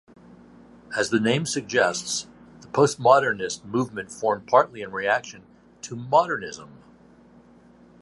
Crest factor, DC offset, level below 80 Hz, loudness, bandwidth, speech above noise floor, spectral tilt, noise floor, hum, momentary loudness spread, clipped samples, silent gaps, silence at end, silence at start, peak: 22 dB; under 0.1%; -64 dBFS; -23 LUFS; 11.5 kHz; 29 dB; -4 dB/octave; -52 dBFS; none; 17 LU; under 0.1%; none; 1.3 s; 0.9 s; -2 dBFS